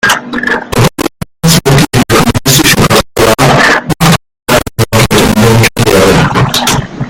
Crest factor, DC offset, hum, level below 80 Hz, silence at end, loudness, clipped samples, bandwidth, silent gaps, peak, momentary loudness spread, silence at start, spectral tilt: 8 dB; under 0.1%; none; -26 dBFS; 0 s; -7 LUFS; 1%; over 20 kHz; none; 0 dBFS; 6 LU; 0.05 s; -4 dB/octave